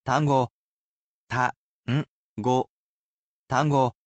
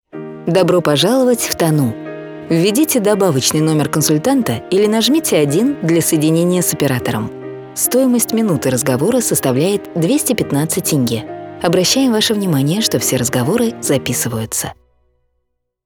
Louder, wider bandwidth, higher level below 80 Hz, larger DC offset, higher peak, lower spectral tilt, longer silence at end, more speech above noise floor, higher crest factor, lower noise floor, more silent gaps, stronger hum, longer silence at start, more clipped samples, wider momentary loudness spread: second, -26 LUFS vs -14 LUFS; second, 8.4 kHz vs over 20 kHz; second, -62 dBFS vs -52 dBFS; neither; second, -8 dBFS vs 0 dBFS; first, -6.5 dB/octave vs -4.5 dB/octave; second, 0.15 s vs 1.15 s; first, over 67 dB vs 55 dB; about the same, 18 dB vs 14 dB; first, under -90 dBFS vs -69 dBFS; first, 0.51-1.27 s, 1.56-1.84 s, 2.08-2.36 s, 2.69-3.47 s vs none; neither; about the same, 0.05 s vs 0.15 s; neither; first, 12 LU vs 8 LU